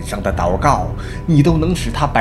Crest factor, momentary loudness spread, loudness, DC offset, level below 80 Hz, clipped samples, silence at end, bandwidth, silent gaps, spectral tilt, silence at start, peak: 16 dB; 8 LU; -16 LUFS; under 0.1%; -26 dBFS; under 0.1%; 0 s; 13 kHz; none; -6.5 dB/octave; 0 s; 0 dBFS